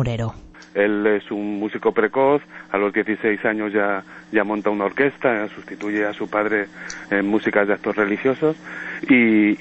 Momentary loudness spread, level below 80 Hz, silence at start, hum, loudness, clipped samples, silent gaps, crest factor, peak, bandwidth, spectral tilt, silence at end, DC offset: 11 LU; -52 dBFS; 0 s; none; -21 LUFS; under 0.1%; none; 18 dB; -2 dBFS; 7.8 kHz; -7 dB/octave; 0 s; under 0.1%